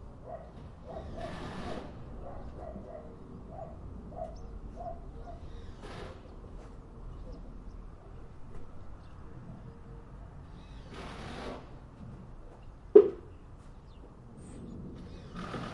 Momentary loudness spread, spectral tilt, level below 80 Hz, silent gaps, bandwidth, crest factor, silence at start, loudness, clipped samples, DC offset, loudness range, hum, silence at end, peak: 10 LU; -7.5 dB/octave; -50 dBFS; none; 11 kHz; 34 dB; 0 s; -34 LUFS; under 0.1%; under 0.1%; 19 LU; none; 0 s; -4 dBFS